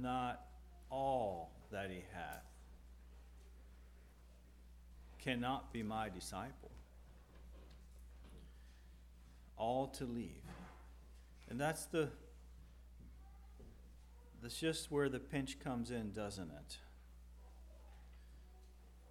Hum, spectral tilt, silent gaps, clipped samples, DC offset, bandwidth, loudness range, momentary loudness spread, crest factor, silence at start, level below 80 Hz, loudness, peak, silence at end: none; -5 dB/octave; none; under 0.1%; under 0.1%; 18 kHz; 9 LU; 23 LU; 24 dB; 0 s; -60 dBFS; -44 LUFS; -24 dBFS; 0 s